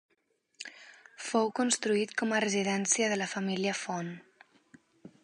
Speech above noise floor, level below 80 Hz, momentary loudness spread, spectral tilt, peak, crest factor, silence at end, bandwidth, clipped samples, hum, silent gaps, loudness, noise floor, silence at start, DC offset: 44 dB; -82 dBFS; 18 LU; -3 dB/octave; -10 dBFS; 22 dB; 0.15 s; 11.5 kHz; under 0.1%; none; none; -30 LUFS; -75 dBFS; 0.6 s; under 0.1%